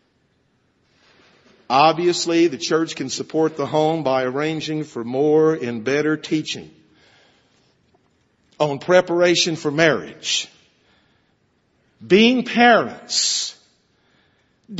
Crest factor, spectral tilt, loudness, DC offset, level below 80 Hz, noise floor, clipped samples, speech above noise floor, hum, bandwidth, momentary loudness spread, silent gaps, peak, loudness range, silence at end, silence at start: 20 dB; -3.5 dB/octave; -19 LUFS; under 0.1%; -66 dBFS; -64 dBFS; under 0.1%; 45 dB; none; 8.2 kHz; 10 LU; none; 0 dBFS; 4 LU; 0 s; 1.7 s